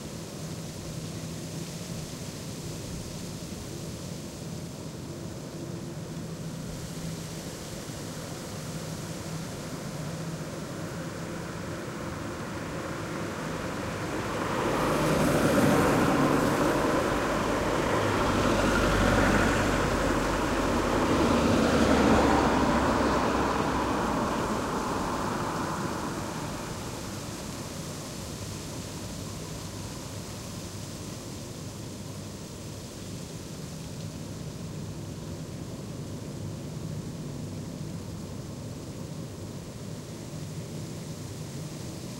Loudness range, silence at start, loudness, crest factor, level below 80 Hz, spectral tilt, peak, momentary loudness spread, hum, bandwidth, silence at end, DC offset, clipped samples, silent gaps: 14 LU; 0 s; -30 LUFS; 20 dB; -44 dBFS; -5 dB/octave; -10 dBFS; 15 LU; none; 16 kHz; 0 s; under 0.1%; under 0.1%; none